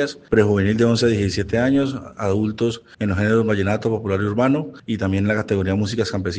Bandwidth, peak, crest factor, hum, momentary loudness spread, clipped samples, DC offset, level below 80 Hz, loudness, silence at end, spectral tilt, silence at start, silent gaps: 9.4 kHz; -2 dBFS; 18 dB; none; 7 LU; under 0.1%; under 0.1%; -48 dBFS; -20 LUFS; 0 s; -6.5 dB/octave; 0 s; none